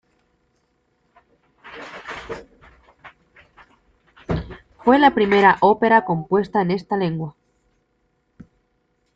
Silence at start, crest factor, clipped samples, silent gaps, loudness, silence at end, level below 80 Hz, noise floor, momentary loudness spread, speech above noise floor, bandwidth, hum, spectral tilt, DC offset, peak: 1.65 s; 20 dB; under 0.1%; none; -18 LUFS; 1.85 s; -48 dBFS; -68 dBFS; 22 LU; 51 dB; 7.8 kHz; none; -7.5 dB/octave; under 0.1%; -2 dBFS